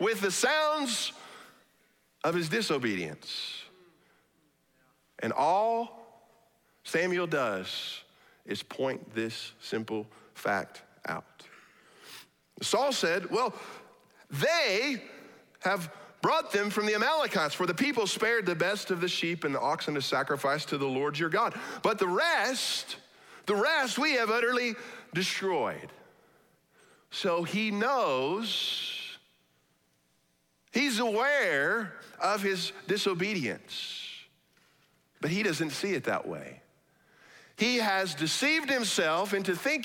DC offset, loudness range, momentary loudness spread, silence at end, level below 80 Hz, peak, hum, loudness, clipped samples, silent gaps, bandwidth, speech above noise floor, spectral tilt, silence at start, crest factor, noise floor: under 0.1%; 6 LU; 14 LU; 0 s; -78 dBFS; -14 dBFS; none; -29 LUFS; under 0.1%; none; 18.5 kHz; 42 dB; -3.5 dB/octave; 0 s; 18 dB; -72 dBFS